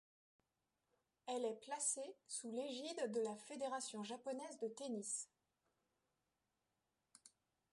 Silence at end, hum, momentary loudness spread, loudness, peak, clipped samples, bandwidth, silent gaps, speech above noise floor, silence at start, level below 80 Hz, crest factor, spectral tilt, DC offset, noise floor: 0.45 s; none; 7 LU; -46 LUFS; -30 dBFS; under 0.1%; 11.5 kHz; none; 44 dB; 1.25 s; under -90 dBFS; 20 dB; -2.5 dB/octave; under 0.1%; -90 dBFS